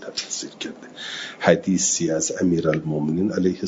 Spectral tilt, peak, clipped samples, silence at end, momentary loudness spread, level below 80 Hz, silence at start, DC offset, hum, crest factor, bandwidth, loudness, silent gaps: -4 dB/octave; -2 dBFS; under 0.1%; 0 s; 13 LU; -60 dBFS; 0 s; under 0.1%; none; 22 dB; 7.8 kHz; -22 LUFS; none